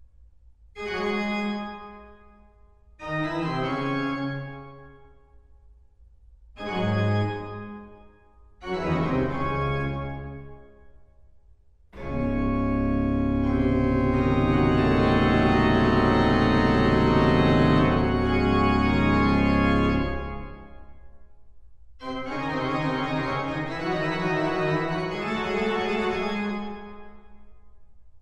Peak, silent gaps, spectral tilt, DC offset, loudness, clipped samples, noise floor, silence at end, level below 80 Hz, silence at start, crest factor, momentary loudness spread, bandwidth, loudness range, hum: -8 dBFS; none; -7.5 dB/octave; under 0.1%; -24 LUFS; under 0.1%; -55 dBFS; 0 s; -36 dBFS; 0.75 s; 18 dB; 17 LU; 9.4 kHz; 11 LU; none